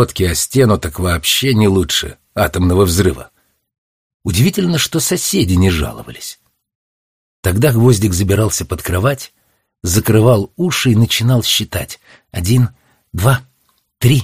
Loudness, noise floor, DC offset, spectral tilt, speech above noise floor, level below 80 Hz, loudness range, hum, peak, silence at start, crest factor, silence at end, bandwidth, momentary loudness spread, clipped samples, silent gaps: -14 LUFS; -61 dBFS; 0.2%; -5 dB/octave; 47 dB; -34 dBFS; 2 LU; none; 0 dBFS; 0 s; 14 dB; 0 s; 15.5 kHz; 13 LU; under 0.1%; 3.78-4.20 s, 6.75-7.43 s